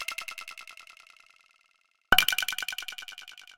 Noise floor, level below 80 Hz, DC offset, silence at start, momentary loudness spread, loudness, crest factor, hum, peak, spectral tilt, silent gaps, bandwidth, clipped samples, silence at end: -70 dBFS; -54 dBFS; under 0.1%; 0 s; 23 LU; -27 LUFS; 30 dB; none; -2 dBFS; 0.5 dB/octave; none; 17 kHz; under 0.1%; 0.15 s